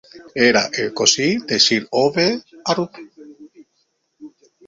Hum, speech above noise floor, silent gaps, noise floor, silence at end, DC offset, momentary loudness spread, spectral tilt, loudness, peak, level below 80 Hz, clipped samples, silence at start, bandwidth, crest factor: none; 50 dB; none; -68 dBFS; 0.4 s; under 0.1%; 9 LU; -2.5 dB/octave; -17 LUFS; 0 dBFS; -60 dBFS; under 0.1%; 0.15 s; 7.8 kHz; 20 dB